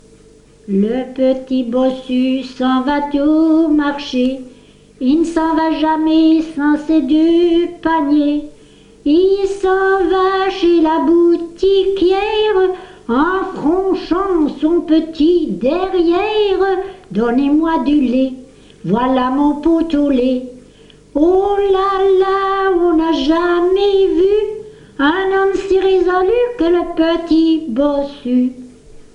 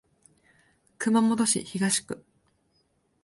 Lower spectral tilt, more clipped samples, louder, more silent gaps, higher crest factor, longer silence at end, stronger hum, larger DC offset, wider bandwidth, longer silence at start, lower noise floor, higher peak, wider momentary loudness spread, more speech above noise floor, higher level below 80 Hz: first, -6.5 dB/octave vs -3.5 dB/octave; neither; first, -14 LUFS vs -25 LUFS; neither; second, 12 dB vs 18 dB; second, 0.15 s vs 1.05 s; first, 50 Hz at -50 dBFS vs none; neither; second, 9.6 kHz vs 11.5 kHz; second, 0.65 s vs 1 s; second, -44 dBFS vs -70 dBFS; first, -2 dBFS vs -10 dBFS; second, 6 LU vs 14 LU; second, 31 dB vs 45 dB; first, -40 dBFS vs -68 dBFS